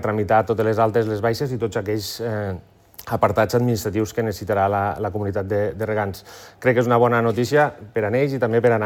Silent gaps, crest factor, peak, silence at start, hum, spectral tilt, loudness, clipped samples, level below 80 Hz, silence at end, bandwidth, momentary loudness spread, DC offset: none; 16 dB; -4 dBFS; 0 s; none; -6.5 dB/octave; -21 LUFS; under 0.1%; -54 dBFS; 0 s; 17.5 kHz; 8 LU; under 0.1%